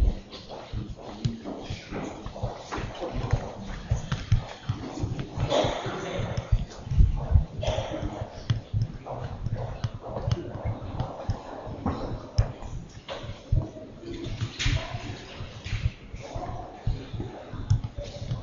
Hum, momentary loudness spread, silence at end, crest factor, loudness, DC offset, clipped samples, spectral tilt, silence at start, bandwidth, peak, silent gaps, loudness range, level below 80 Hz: none; 12 LU; 0 s; 24 dB; -32 LUFS; under 0.1%; under 0.1%; -6 dB/octave; 0 s; 7.4 kHz; -6 dBFS; none; 6 LU; -34 dBFS